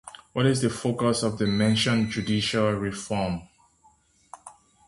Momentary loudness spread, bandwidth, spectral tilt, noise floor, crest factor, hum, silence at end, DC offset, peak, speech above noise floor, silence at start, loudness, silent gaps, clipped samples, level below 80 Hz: 12 LU; 11.5 kHz; -5 dB/octave; -61 dBFS; 18 dB; none; 0.35 s; under 0.1%; -8 dBFS; 37 dB; 0.05 s; -25 LUFS; none; under 0.1%; -52 dBFS